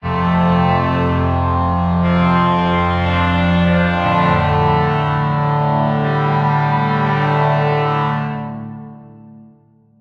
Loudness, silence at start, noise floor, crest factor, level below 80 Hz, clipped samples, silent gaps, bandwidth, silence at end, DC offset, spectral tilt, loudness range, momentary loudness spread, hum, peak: -16 LUFS; 0.05 s; -50 dBFS; 14 dB; -40 dBFS; under 0.1%; none; 6 kHz; 0.6 s; under 0.1%; -8.5 dB/octave; 3 LU; 3 LU; none; -2 dBFS